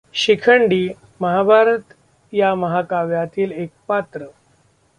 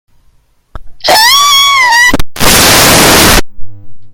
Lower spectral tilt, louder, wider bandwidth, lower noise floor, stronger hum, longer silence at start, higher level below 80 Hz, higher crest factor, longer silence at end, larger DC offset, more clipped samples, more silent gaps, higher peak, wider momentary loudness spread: first, -5.5 dB/octave vs -1.5 dB/octave; second, -17 LUFS vs -4 LUFS; second, 10 kHz vs over 20 kHz; first, -58 dBFS vs -47 dBFS; neither; second, 0.15 s vs 0.75 s; second, -60 dBFS vs -22 dBFS; first, 16 dB vs 6 dB; first, 0.7 s vs 0 s; neither; second, under 0.1% vs 3%; neither; about the same, -2 dBFS vs 0 dBFS; first, 12 LU vs 6 LU